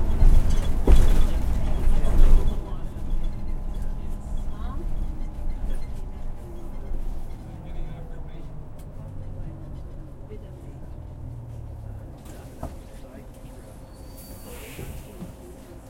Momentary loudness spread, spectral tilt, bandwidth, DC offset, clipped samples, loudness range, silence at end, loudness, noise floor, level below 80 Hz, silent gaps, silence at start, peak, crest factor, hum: 19 LU; -7 dB/octave; 10.5 kHz; under 0.1%; under 0.1%; 15 LU; 0 s; -31 LUFS; -42 dBFS; -24 dBFS; none; 0 s; -2 dBFS; 20 dB; none